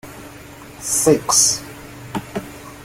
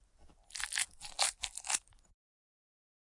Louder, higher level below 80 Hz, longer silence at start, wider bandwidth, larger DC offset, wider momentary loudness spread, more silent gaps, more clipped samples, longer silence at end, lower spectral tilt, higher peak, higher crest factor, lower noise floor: first, -16 LUFS vs -35 LUFS; first, -48 dBFS vs -64 dBFS; second, 0.05 s vs 0.2 s; first, 17 kHz vs 11.5 kHz; neither; first, 24 LU vs 8 LU; neither; neither; second, 0 s vs 1.3 s; first, -2.5 dB/octave vs 2.5 dB/octave; first, -2 dBFS vs -14 dBFS; second, 20 dB vs 28 dB; second, -38 dBFS vs -62 dBFS